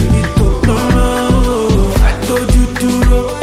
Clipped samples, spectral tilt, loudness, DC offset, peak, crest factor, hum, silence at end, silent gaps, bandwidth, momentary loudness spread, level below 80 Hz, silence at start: under 0.1%; -6 dB/octave; -13 LUFS; under 0.1%; 0 dBFS; 10 dB; none; 0 s; none; 15.5 kHz; 2 LU; -14 dBFS; 0 s